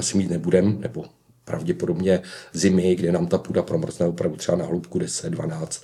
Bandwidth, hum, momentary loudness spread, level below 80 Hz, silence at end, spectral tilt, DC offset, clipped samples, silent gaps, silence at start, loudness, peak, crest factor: 13 kHz; none; 10 LU; -56 dBFS; 0.05 s; -6 dB/octave; under 0.1%; under 0.1%; none; 0 s; -23 LUFS; -4 dBFS; 18 dB